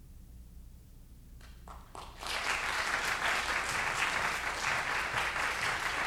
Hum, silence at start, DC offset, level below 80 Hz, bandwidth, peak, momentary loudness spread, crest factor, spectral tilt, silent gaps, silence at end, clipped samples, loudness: none; 0 s; under 0.1%; -52 dBFS; over 20 kHz; -16 dBFS; 18 LU; 20 dB; -1.5 dB/octave; none; 0 s; under 0.1%; -32 LUFS